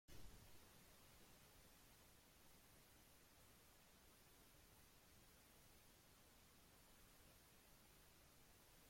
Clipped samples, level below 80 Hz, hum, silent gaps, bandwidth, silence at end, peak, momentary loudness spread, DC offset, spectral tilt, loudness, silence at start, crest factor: under 0.1%; -76 dBFS; none; none; 16.5 kHz; 0 s; -48 dBFS; 2 LU; under 0.1%; -3 dB/octave; -69 LUFS; 0.1 s; 20 dB